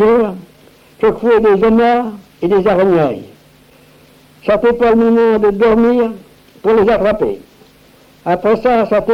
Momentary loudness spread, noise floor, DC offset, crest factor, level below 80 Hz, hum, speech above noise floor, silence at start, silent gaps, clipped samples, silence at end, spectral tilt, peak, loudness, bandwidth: 11 LU; -45 dBFS; under 0.1%; 10 dB; -40 dBFS; none; 34 dB; 0 s; none; under 0.1%; 0 s; -8 dB/octave; -2 dBFS; -13 LUFS; 6.4 kHz